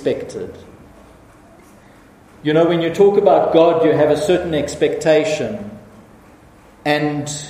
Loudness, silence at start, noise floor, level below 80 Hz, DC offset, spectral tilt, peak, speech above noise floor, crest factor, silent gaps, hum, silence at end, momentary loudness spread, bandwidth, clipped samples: -16 LUFS; 0 s; -46 dBFS; -50 dBFS; under 0.1%; -5.5 dB/octave; 0 dBFS; 30 dB; 18 dB; none; none; 0 s; 15 LU; 15 kHz; under 0.1%